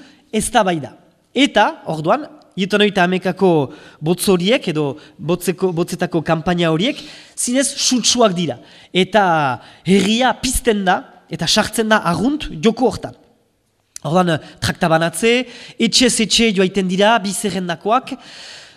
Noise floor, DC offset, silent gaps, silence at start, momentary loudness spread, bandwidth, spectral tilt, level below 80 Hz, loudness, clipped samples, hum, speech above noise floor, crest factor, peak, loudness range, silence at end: -63 dBFS; under 0.1%; none; 0.35 s; 12 LU; 14.5 kHz; -4 dB/octave; -42 dBFS; -16 LUFS; under 0.1%; none; 46 dB; 18 dB; 0 dBFS; 3 LU; 0.15 s